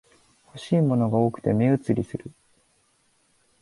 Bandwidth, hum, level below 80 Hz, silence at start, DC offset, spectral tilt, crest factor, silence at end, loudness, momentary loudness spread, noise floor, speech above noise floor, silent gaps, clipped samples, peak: 11.5 kHz; none; -58 dBFS; 0.55 s; under 0.1%; -9 dB/octave; 18 dB; 1.35 s; -23 LUFS; 16 LU; -66 dBFS; 43 dB; none; under 0.1%; -8 dBFS